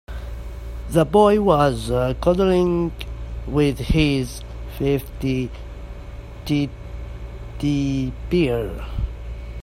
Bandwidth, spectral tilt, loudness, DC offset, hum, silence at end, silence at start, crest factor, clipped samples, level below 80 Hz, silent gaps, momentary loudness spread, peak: 16 kHz; -7 dB/octave; -21 LUFS; under 0.1%; none; 0 s; 0.1 s; 20 dB; under 0.1%; -32 dBFS; none; 18 LU; -2 dBFS